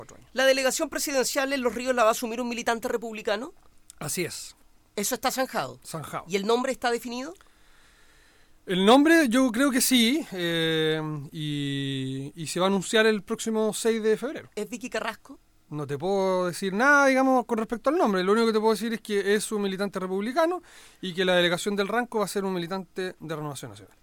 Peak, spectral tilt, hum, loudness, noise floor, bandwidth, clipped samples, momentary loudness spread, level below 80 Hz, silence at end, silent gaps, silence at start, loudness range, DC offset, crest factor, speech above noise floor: -8 dBFS; -4 dB/octave; none; -25 LUFS; -56 dBFS; 19 kHz; under 0.1%; 15 LU; -60 dBFS; 0.2 s; none; 0 s; 7 LU; under 0.1%; 18 dB; 31 dB